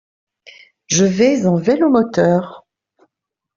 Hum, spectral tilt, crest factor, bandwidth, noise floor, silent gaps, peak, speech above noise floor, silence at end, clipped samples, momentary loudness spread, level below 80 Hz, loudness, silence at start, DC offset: none; -5 dB/octave; 14 dB; 7.6 kHz; -79 dBFS; none; -2 dBFS; 66 dB; 1 s; under 0.1%; 6 LU; -56 dBFS; -15 LUFS; 0.9 s; under 0.1%